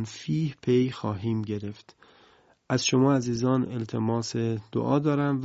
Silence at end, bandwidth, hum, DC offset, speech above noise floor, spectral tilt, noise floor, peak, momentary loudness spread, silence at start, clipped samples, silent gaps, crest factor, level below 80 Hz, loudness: 0 s; 8 kHz; none; under 0.1%; 33 dB; -6 dB/octave; -59 dBFS; -10 dBFS; 8 LU; 0 s; under 0.1%; none; 16 dB; -58 dBFS; -27 LUFS